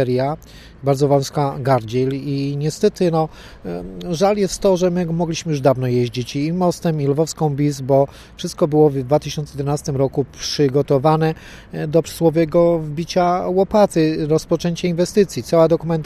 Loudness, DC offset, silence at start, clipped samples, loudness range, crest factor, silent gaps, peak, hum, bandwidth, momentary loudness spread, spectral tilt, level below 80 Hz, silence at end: -18 LUFS; under 0.1%; 0 s; under 0.1%; 2 LU; 16 dB; none; -2 dBFS; none; 14 kHz; 9 LU; -6.5 dB/octave; -44 dBFS; 0 s